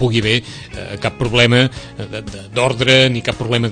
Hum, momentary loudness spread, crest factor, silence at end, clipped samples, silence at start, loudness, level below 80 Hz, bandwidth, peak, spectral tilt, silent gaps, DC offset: none; 17 LU; 16 dB; 0 s; under 0.1%; 0 s; -15 LUFS; -40 dBFS; 9.8 kHz; 0 dBFS; -5 dB/octave; none; under 0.1%